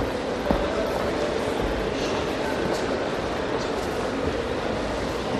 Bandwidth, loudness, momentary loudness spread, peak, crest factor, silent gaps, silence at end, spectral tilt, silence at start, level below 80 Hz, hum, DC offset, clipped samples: 13 kHz; -26 LUFS; 2 LU; -6 dBFS; 18 dB; none; 0 s; -5 dB/octave; 0 s; -40 dBFS; none; under 0.1%; under 0.1%